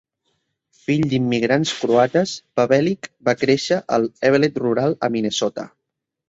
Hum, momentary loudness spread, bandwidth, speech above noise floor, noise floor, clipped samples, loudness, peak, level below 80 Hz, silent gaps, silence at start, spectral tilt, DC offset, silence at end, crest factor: none; 7 LU; 8 kHz; 61 dB; -80 dBFS; under 0.1%; -19 LUFS; -2 dBFS; -58 dBFS; none; 0.9 s; -5.5 dB/octave; under 0.1%; 0.6 s; 18 dB